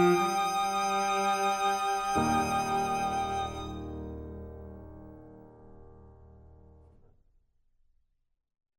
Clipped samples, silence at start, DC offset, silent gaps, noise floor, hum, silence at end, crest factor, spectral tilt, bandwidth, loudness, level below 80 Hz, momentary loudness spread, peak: under 0.1%; 0 s; under 0.1%; none; -71 dBFS; none; 2.25 s; 18 dB; -4 dB/octave; 16 kHz; -29 LUFS; -52 dBFS; 20 LU; -14 dBFS